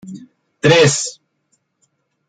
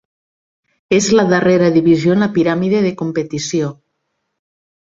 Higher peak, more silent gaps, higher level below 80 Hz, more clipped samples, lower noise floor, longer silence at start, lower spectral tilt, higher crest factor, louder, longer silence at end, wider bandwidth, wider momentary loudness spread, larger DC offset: about the same, -2 dBFS vs -2 dBFS; neither; about the same, -56 dBFS vs -52 dBFS; neither; second, -66 dBFS vs -71 dBFS; second, 0.05 s vs 0.9 s; second, -4 dB/octave vs -5.5 dB/octave; about the same, 18 dB vs 14 dB; about the same, -14 LUFS vs -14 LUFS; about the same, 1.2 s vs 1.15 s; first, 9.4 kHz vs 7.8 kHz; first, 25 LU vs 9 LU; neither